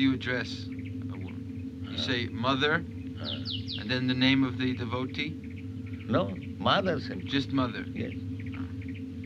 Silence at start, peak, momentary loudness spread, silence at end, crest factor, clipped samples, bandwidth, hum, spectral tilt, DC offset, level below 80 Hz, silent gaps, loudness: 0 s; -10 dBFS; 13 LU; 0 s; 20 dB; under 0.1%; 7.6 kHz; none; -6.5 dB/octave; under 0.1%; -54 dBFS; none; -31 LUFS